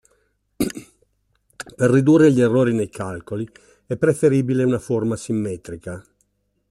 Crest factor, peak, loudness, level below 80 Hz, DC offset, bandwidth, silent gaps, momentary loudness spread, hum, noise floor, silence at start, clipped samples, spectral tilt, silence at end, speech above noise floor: 16 dB; -4 dBFS; -19 LUFS; -54 dBFS; under 0.1%; 13.5 kHz; none; 20 LU; none; -67 dBFS; 0.6 s; under 0.1%; -7 dB/octave; 0.7 s; 49 dB